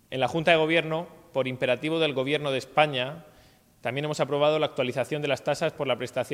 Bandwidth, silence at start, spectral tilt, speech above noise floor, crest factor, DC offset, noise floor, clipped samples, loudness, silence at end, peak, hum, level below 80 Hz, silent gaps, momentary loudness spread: 16 kHz; 0.1 s; -5 dB/octave; 31 dB; 20 dB; under 0.1%; -57 dBFS; under 0.1%; -26 LUFS; 0 s; -6 dBFS; none; -66 dBFS; none; 10 LU